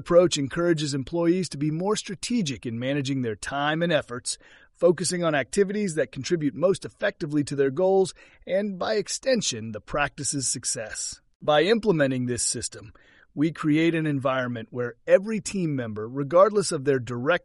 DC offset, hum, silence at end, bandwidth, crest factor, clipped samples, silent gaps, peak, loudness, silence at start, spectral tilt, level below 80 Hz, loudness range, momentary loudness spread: under 0.1%; none; 0.05 s; 11.5 kHz; 20 dB; under 0.1%; 11.35-11.40 s; -6 dBFS; -25 LUFS; 0 s; -4.5 dB/octave; -54 dBFS; 2 LU; 10 LU